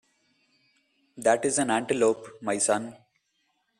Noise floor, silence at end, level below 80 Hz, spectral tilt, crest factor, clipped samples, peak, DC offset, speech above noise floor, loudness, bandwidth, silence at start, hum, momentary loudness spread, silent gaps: -74 dBFS; 0.85 s; -70 dBFS; -3 dB/octave; 20 dB; under 0.1%; -8 dBFS; under 0.1%; 48 dB; -26 LUFS; 14 kHz; 1.15 s; none; 8 LU; none